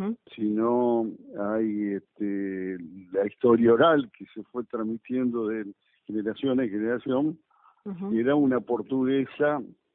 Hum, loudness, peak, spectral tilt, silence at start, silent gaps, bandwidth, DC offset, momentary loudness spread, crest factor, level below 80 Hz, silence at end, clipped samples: none; -26 LUFS; -8 dBFS; -11 dB/octave; 0 s; none; 3.9 kHz; under 0.1%; 15 LU; 18 dB; -68 dBFS; 0.25 s; under 0.1%